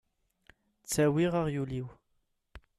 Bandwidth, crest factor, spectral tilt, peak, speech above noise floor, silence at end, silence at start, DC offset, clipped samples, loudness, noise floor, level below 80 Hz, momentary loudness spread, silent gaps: 13.5 kHz; 16 dB; -6 dB/octave; -18 dBFS; 47 dB; 0.2 s; 0.9 s; under 0.1%; under 0.1%; -30 LUFS; -77 dBFS; -58 dBFS; 18 LU; none